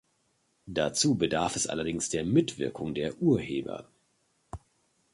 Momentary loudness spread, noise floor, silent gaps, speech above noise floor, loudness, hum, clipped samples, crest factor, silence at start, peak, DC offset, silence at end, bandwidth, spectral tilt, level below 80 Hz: 18 LU; -72 dBFS; none; 44 dB; -29 LUFS; none; under 0.1%; 20 dB; 0.65 s; -12 dBFS; under 0.1%; 0.55 s; 11.5 kHz; -4.5 dB/octave; -56 dBFS